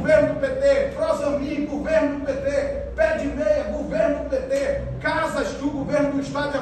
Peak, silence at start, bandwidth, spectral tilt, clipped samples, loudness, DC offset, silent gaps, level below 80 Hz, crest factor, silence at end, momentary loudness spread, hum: -6 dBFS; 0 s; 12 kHz; -6 dB/octave; under 0.1%; -23 LUFS; under 0.1%; none; -38 dBFS; 16 dB; 0 s; 6 LU; none